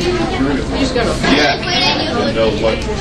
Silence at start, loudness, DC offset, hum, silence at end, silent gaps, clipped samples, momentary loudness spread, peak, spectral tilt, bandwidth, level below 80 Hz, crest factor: 0 s; -14 LUFS; under 0.1%; none; 0 s; none; under 0.1%; 5 LU; 0 dBFS; -4.5 dB/octave; 12.5 kHz; -26 dBFS; 14 dB